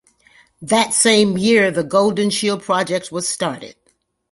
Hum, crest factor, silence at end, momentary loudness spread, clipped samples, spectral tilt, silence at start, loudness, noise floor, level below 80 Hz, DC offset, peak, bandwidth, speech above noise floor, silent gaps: none; 18 dB; 0.6 s; 10 LU; under 0.1%; -3 dB/octave; 0.6 s; -16 LUFS; -64 dBFS; -58 dBFS; under 0.1%; -2 dBFS; 11.5 kHz; 47 dB; none